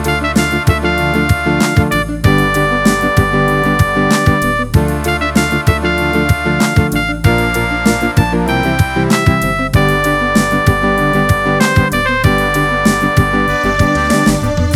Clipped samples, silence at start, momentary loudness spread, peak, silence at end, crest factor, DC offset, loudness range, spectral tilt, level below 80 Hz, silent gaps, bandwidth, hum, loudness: under 0.1%; 0 s; 2 LU; 0 dBFS; 0 s; 12 dB; under 0.1%; 1 LU; -5.5 dB/octave; -24 dBFS; none; 18.5 kHz; none; -13 LUFS